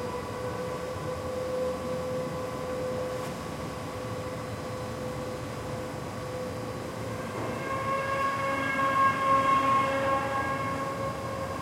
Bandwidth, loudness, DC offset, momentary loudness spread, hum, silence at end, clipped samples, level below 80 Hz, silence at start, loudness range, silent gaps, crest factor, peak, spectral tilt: 16.5 kHz; -30 LUFS; under 0.1%; 12 LU; none; 0 s; under 0.1%; -54 dBFS; 0 s; 9 LU; none; 18 dB; -14 dBFS; -5 dB/octave